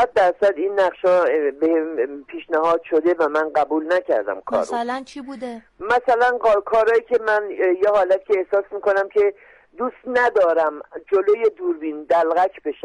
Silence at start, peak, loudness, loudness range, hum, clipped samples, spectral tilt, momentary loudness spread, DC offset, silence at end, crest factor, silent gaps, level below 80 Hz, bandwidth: 0 s; -8 dBFS; -19 LUFS; 3 LU; none; under 0.1%; -5 dB/octave; 10 LU; under 0.1%; 0.1 s; 12 dB; none; -60 dBFS; 11 kHz